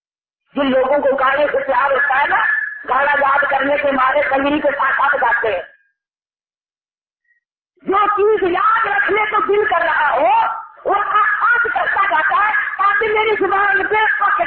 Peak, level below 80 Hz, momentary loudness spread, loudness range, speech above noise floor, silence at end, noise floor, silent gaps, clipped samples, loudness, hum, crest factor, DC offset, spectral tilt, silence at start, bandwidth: -4 dBFS; -52 dBFS; 4 LU; 5 LU; over 75 dB; 0 s; under -90 dBFS; none; under 0.1%; -15 LUFS; none; 12 dB; under 0.1%; -8.5 dB/octave; 0.55 s; 4.5 kHz